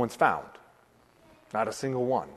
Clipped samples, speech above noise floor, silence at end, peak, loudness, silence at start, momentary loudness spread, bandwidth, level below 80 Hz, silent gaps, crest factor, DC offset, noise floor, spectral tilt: under 0.1%; 33 dB; 0 s; -8 dBFS; -29 LUFS; 0 s; 10 LU; 13.5 kHz; -68 dBFS; none; 24 dB; under 0.1%; -61 dBFS; -5.5 dB/octave